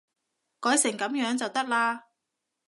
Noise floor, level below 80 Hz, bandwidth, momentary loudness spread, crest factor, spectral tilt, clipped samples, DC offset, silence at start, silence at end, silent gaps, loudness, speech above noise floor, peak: -83 dBFS; -84 dBFS; 12 kHz; 6 LU; 18 dB; -1.5 dB/octave; under 0.1%; under 0.1%; 0.6 s; 0.7 s; none; -26 LUFS; 57 dB; -10 dBFS